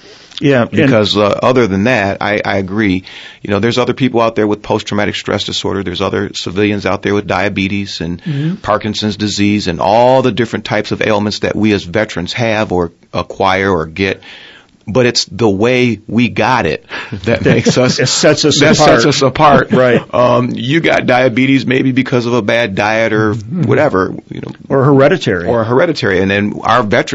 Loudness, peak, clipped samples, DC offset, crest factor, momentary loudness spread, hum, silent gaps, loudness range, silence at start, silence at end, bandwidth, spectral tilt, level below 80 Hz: -12 LUFS; 0 dBFS; 0.2%; under 0.1%; 12 dB; 8 LU; none; none; 6 LU; 0.1 s; 0 s; 8 kHz; -5 dB/octave; -42 dBFS